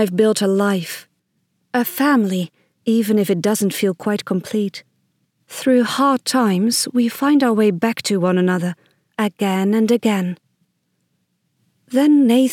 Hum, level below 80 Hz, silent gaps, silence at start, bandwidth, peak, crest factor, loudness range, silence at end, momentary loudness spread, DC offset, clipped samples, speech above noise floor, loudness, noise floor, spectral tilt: none; -76 dBFS; none; 0 s; 17.5 kHz; -2 dBFS; 16 dB; 4 LU; 0 s; 11 LU; under 0.1%; under 0.1%; 52 dB; -18 LUFS; -69 dBFS; -5 dB/octave